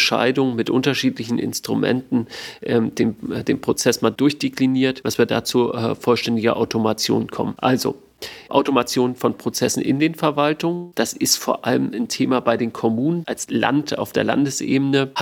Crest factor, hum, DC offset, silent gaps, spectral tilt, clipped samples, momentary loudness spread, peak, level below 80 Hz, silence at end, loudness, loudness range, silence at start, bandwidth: 18 dB; none; under 0.1%; none; -4.5 dB/octave; under 0.1%; 5 LU; -2 dBFS; -58 dBFS; 0 s; -20 LUFS; 1 LU; 0 s; 18 kHz